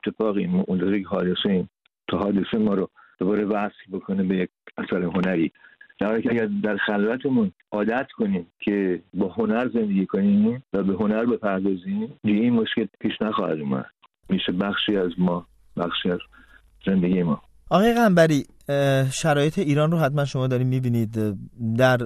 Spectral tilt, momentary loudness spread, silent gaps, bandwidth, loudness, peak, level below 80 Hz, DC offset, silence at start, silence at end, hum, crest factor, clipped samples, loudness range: -6.5 dB/octave; 8 LU; none; 13.5 kHz; -23 LUFS; -4 dBFS; -54 dBFS; under 0.1%; 0.05 s; 0 s; none; 20 dB; under 0.1%; 5 LU